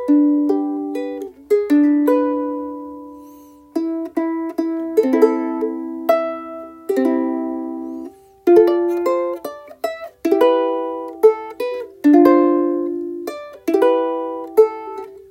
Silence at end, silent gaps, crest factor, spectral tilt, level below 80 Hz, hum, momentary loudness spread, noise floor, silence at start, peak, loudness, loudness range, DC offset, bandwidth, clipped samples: 0.15 s; none; 18 dB; -5.5 dB/octave; -64 dBFS; none; 16 LU; -43 dBFS; 0 s; 0 dBFS; -18 LUFS; 5 LU; under 0.1%; 16.5 kHz; under 0.1%